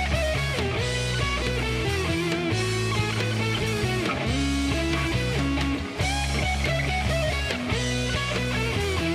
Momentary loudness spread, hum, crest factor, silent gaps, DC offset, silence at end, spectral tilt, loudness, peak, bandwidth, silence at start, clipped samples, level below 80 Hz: 1 LU; none; 14 dB; none; under 0.1%; 0 s; -4.5 dB/octave; -25 LUFS; -10 dBFS; 15 kHz; 0 s; under 0.1%; -34 dBFS